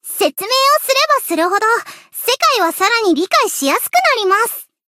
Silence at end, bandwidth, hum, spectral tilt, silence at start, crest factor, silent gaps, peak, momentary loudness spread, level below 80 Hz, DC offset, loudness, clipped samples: 0.25 s; 16.5 kHz; none; 0 dB/octave; 0.05 s; 14 dB; none; 0 dBFS; 6 LU; -70 dBFS; under 0.1%; -14 LUFS; under 0.1%